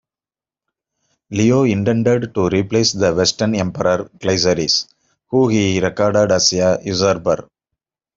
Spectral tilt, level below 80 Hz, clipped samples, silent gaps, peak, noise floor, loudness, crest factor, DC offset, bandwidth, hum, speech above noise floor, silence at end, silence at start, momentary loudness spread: -4.5 dB/octave; -50 dBFS; under 0.1%; none; -2 dBFS; under -90 dBFS; -16 LUFS; 16 dB; under 0.1%; 7.8 kHz; none; over 74 dB; 0.75 s; 1.3 s; 6 LU